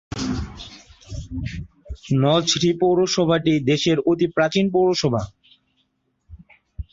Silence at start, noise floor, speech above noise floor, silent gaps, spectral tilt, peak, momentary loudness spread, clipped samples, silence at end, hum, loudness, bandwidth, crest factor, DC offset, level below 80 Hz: 0.1 s; -69 dBFS; 50 dB; none; -5 dB/octave; -6 dBFS; 19 LU; under 0.1%; 0.1 s; none; -20 LUFS; 7.8 kHz; 16 dB; under 0.1%; -42 dBFS